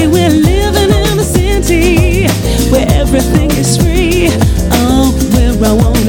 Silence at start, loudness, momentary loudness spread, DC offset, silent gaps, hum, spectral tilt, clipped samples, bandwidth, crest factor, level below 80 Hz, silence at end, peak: 0 s; -10 LUFS; 2 LU; under 0.1%; none; none; -5.5 dB/octave; under 0.1%; 18.5 kHz; 8 dB; -14 dBFS; 0 s; 0 dBFS